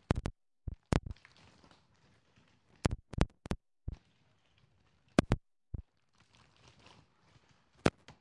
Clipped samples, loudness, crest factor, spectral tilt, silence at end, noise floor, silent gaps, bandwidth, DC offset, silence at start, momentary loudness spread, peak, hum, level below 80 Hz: under 0.1%; -38 LUFS; 30 dB; -6.5 dB/octave; 0.1 s; -72 dBFS; none; 11 kHz; under 0.1%; 0.1 s; 17 LU; -10 dBFS; none; -48 dBFS